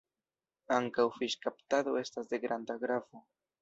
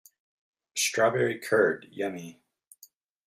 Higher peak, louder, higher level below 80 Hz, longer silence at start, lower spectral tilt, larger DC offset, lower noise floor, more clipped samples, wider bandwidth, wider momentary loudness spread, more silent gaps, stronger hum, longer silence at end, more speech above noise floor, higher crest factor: second, -14 dBFS vs -10 dBFS; second, -34 LUFS vs -27 LUFS; about the same, -80 dBFS vs -76 dBFS; about the same, 0.7 s vs 0.75 s; about the same, -2.5 dB/octave vs -3 dB/octave; neither; first, under -90 dBFS vs -59 dBFS; neither; second, 8 kHz vs 16 kHz; second, 6 LU vs 13 LU; neither; neither; second, 0.4 s vs 0.95 s; first, over 56 dB vs 32 dB; about the same, 20 dB vs 20 dB